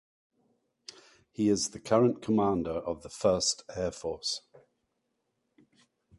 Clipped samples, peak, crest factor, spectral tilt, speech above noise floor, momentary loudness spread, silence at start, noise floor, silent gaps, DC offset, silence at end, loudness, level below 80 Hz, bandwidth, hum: under 0.1%; -12 dBFS; 20 dB; -4.5 dB/octave; 51 dB; 22 LU; 1.4 s; -80 dBFS; none; under 0.1%; 1.8 s; -30 LUFS; -58 dBFS; 11.5 kHz; none